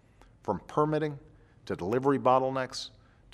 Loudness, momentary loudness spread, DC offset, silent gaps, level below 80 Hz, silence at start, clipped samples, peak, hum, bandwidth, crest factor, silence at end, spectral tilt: -29 LUFS; 16 LU; under 0.1%; none; -62 dBFS; 0.45 s; under 0.1%; -12 dBFS; none; 12.5 kHz; 20 dB; 0.45 s; -6.5 dB/octave